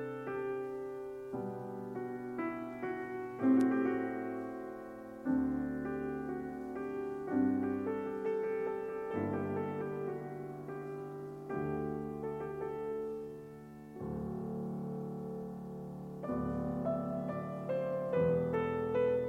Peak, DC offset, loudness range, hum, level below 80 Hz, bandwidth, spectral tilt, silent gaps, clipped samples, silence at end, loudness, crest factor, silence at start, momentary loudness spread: -20 dBFS; under 0.1%; 6 LU; none; -62 dBFS; 10.5 kHz; -9 dB/octave; none; under 0.1%; 0 s; -38 LUFS; 18 dB; 0 s; 12 LU